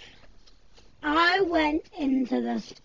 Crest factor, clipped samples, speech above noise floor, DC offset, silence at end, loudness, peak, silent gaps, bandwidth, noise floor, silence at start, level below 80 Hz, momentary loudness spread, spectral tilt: 18 dB; under 0.1%; 30 dB; 0.2%; 0.1 s; -25 LUFS; -10 dBFS; none; 7.6 kHz; -57 dBFS; 0 s; -54 dBFS; 9 LU; -4.5 dB/octave